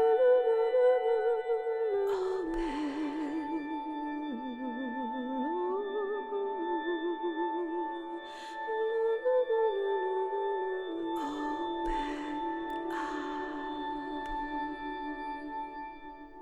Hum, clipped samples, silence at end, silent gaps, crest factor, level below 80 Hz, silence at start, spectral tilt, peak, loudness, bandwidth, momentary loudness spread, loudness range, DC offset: none; under 0.1%; 0 s; none; 16 dB; -56 dBFS; 0 s; -5 dB/octave; -16 dBFS; -33 LUFS; 9.2 kHz; 11 LU; 6 LU; under 0.1%